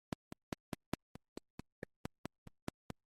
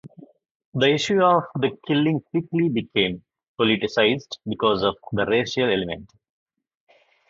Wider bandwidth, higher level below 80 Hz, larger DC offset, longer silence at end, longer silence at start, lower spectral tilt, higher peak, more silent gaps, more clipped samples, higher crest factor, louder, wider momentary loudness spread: first, 14.5 kHz vs 7.8 kHz; second, -66 dBFS vs -56 dBFS; neither; first, 2.35 s vs 1.25 s; first, 0.7 s vs 0.05 s; about the same, -5.5 dB/octave vs -5.5 dB/octave; second, -18 dBFS vs -4 dBFS; second, none vs 0.51-0.72 s, 3.48-3.55 s; neither; first, 34 dB vs 20 dB; second, -52 LUFS vs -22 LUFS; about the same, 9 LU vs 9 LU